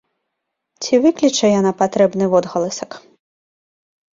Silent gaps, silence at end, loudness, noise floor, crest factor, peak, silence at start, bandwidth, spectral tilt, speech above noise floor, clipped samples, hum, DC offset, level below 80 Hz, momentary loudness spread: none; 1.15 s; -16 LUFS; -77 dBFS; 16 dB; -2 dBFS; 0.8 s; 7.8 kHz; -5 dB/octave; 61 dB; under 0.1%; none; under 0.1%; -60 dBFS; 13 LU